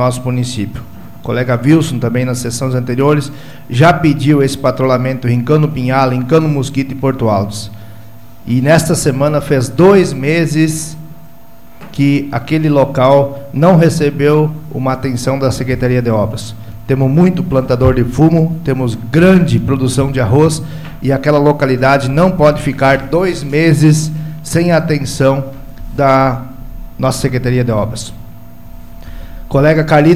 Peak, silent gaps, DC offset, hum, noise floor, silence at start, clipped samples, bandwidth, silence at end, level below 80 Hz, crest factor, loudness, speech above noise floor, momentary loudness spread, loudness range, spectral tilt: 0 dBFS; none; 3%; none; -40 dBFS; 0 s; under 0.1%; 14.5 kHz; 0 s; -34 dBFS; 12 dB; -12 LUFS; 29 dB; 12 LU; 3 LU; -6.5 dB/octave